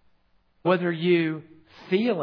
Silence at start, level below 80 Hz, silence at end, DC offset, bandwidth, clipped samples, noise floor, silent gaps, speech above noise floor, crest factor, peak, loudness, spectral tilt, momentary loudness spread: 0.65 s; -74 dBFS; 0 s; under 0.1%; 5.4 kHz; under 0.1%; -64 dBFS; none; 40 dB; 18 dB; -8 dBFS; -25 LUFS; -9 dB/octave; 7 LU